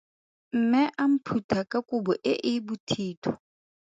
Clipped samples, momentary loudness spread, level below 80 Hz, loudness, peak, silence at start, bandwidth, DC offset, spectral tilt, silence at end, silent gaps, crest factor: under 0.1%; 9 LU; -64 dBFS; -27 LUFS; -10 dBFS; 0.55 s; 7.8 kHz; under 0.1%; -6 dB/octave; 0.6 s; 1.44-1.49 s, 2.80-2.87 s, 3.17-3.22 s; 16 dB